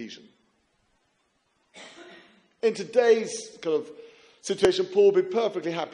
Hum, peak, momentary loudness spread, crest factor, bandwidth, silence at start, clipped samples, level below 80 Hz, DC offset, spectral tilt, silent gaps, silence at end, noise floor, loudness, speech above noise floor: none; -8 dBFS; 24 LU; 20 dB; 11.5 kHz; 0 s; under 0.1%; -66 dBFS; under 0.1%; -4 dB/octave; none; 0.05 s; -71 dBFS; -24 LUFS; 47 dB